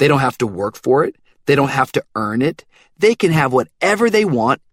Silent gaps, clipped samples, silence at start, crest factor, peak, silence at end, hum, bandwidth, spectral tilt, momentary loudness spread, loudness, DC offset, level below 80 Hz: none; under 0.1%; 0 s; 16 dB; 0 dBFS; 0.15 s; none; 16 kHz; -6 dB/octave; 7 LU; -17 LUFS; under 0.1%; -52 dBFS